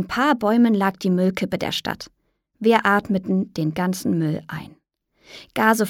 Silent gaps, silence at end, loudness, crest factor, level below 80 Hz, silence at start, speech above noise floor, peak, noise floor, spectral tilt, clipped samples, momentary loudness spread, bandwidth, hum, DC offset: none; 0 s; -21 LUFS; 18 dB; -56 dBFS; 0 s; 42 dB; -2 dBFS; -63 dBFS; -5.5 dB/octave; under 0.1%; 13 LU; 17 kHz; none; under 0.1%